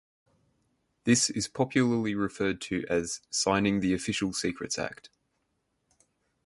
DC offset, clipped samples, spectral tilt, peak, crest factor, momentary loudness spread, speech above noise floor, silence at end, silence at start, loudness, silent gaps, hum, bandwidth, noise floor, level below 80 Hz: under 0.1%; under 0.1%; -4 dB/octave; -10 dBFS; 20 dB; 8 LU; 49 dB; 1.4 s; 1.05 s; -28 LUFS; none; none; 11.5 kHz; -77 dBFS; -58 dBFS